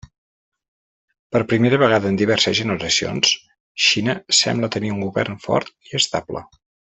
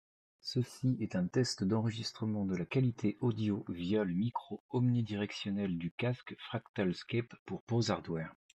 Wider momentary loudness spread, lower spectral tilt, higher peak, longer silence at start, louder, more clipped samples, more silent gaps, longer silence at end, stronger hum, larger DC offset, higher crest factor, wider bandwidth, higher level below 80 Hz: about the same, 9 LU vs 8 LU; second, -3.5 dB/octave vs -6.5 dB/octave; first, -2 dBFS vs -18 dBFS; first, 1.3 s vs 0.45 s; first, -18 LUFS vs -36 LUFS; neither; second, 3.60-3.75 s vs 4.60-4.69 s, 5.91-5.98 s, 6.69-6.74 s, 7.39-7.46 s, 7.60-7.67 s; first, 0.55 s vs 0.25 s; neither; neither; about the same, 18 dB vs 18 dB; second, 8.4 kHz vs 11 kHz; first, -56 dBFS vs -70 dBFS